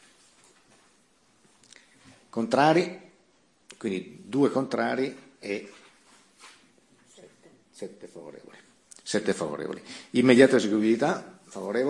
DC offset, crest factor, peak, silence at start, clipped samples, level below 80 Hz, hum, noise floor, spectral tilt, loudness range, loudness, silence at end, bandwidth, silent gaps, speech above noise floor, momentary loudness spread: under 0.1%; 24 dB; -4 dBFS; 2.35 s; under 0.1%; -74 dBFS; none; -65 dBFS; -5.5 dB/octave; 18 LU; -25 LUFS; 0 s; 11.5 kHz; none; 39 dB; 23 LU